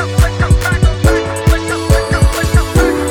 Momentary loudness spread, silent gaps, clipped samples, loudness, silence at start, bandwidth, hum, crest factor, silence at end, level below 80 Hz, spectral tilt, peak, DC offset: 2 LU; none; under 0.1%; -13 LUFS; 0 s; 19 kHz; none; 12 dB; 0 s; -16 dBFS; -5.5 dB/octave; 0 dBFS; under 0.1%